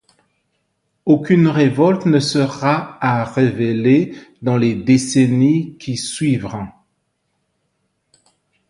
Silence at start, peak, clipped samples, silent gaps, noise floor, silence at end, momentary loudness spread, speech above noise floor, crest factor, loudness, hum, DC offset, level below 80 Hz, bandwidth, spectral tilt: 1.05 s; 0 dBFS; under 0.1%; none; -69 dBFS; 2 s; 11 LU; 54 dB; 16 dB; -16 LUFS; none; under 0.1%; -54 dBFS; 11 kHz; -6.5 dB/octave